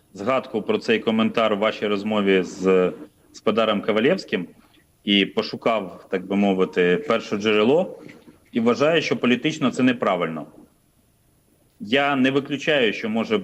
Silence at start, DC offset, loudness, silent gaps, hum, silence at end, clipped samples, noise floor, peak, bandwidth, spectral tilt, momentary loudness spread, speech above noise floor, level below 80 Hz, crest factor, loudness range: 0.15 s; under 0.1%; -21 LUFS; none; none; 0 s; under 0.1%; -61 dBFS; -4 dBFS; 10.5 kHz; -5.5 dB/octave; 9 LU; 40 dB; -66 dBFS; 18 dB; 2 LU